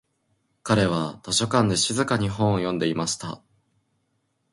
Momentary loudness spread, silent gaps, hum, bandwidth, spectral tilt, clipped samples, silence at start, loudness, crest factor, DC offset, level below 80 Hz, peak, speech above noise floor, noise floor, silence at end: 10 LU; none; none; 11.5 kHz; -4.5 dB/octave; under 0.1%; 0.65 s; -23 LUFS; 20 dB; under 0.1%; -52 dBFS; -6 dBFS; 49 dB; -72 dBFS; 1.15 s